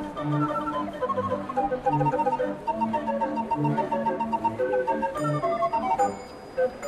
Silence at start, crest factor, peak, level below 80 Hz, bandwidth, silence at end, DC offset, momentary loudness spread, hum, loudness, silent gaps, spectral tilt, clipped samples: 0 s; 14 dB; -12 dBFS; -54 dBFS; 14 kHz; 0 s; under 0.1%; 4 LU; none; -27 LUFS; none; -7.5 dB/octave; under 0.1%